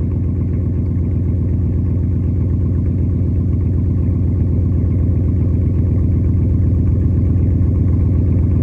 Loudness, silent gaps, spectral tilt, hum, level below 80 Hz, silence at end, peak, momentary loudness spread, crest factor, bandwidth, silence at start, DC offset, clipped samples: -16 LUFS; none; -12.5 dB/octave; none; -22 dBFS; 0 s; -4 dBFS; 3 LU; 10 dB; 2.5 kHz; 0 s; under 0.1%; under 0.1%